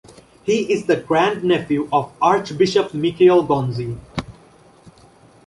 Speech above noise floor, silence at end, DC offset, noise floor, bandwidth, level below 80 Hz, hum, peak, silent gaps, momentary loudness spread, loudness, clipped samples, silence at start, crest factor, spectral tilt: 31 dB; 1.15 s; under 0.1%; -49 dBFS; 11.5 kHz; -52 dBFS; none; -2 dBFS; none; 13 LU; -18 LUFS; under 0.1%; 0.45 s; 16 dB; -6 dB/octave